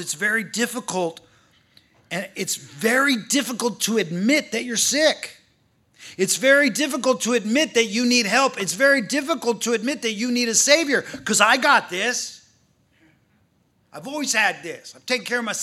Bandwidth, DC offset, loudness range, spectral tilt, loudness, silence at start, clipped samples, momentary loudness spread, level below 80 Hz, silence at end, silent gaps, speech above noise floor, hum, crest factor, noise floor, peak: 15.5 kHz; under 0.1%; 5 LU; -2 dB/octave; -20 LUFS; 0 s; under 0.1%; 12 LU; -72 dBFS; 0 s; none; 42 dB; none; 22 dB; -64 dBFS; 0 dBFS